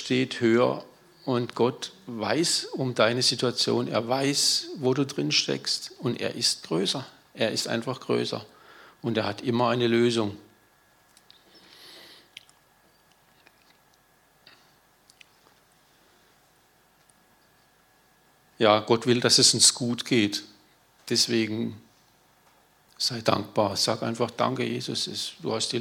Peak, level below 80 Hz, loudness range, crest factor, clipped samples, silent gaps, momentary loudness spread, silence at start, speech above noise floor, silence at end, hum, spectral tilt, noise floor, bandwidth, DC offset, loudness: -4 dBFS; -74 dBFS; 7 LU; 24 dB; under 0.1%; none; 11 LU; 0 s; 37 dB; 0 s; none; -3 dB/octave; -62 dBFS; 17.5 kHz; under 0.1%; -25 LUFS